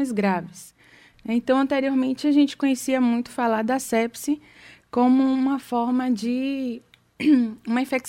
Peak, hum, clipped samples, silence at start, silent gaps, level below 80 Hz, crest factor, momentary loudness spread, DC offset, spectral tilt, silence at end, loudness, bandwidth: -8 dBFS; none; under 0.1%; 0 s; none; -64 dBFS; 14 dB; 9 LU; under 0.1%; -5 dB/octave; 0 s; -23 LUFS; 16 kHz